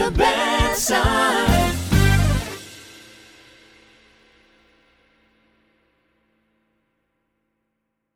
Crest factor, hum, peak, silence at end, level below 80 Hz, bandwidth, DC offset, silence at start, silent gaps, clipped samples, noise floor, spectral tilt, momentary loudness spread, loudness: 20 dB; none; -2 dBFS; 5.3 s; -30 dBFS; 19.5 kHz; under 0.1%; 0 s; none; under 0.1%; -76 dBFS; -4.5 dB/octave; 19 LU; -19 LUFS